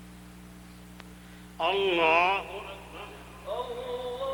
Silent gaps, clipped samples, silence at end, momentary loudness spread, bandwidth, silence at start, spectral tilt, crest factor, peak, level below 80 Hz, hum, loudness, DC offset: none; under 0.1%; 0 s; 26 LU; over 20 kHz; 0 s; -4 dB/octave; 22 dB; -10 dBFS; -54 dBFS; 60 Hz at -50 dBFS; -27 LUFS; under 0.1%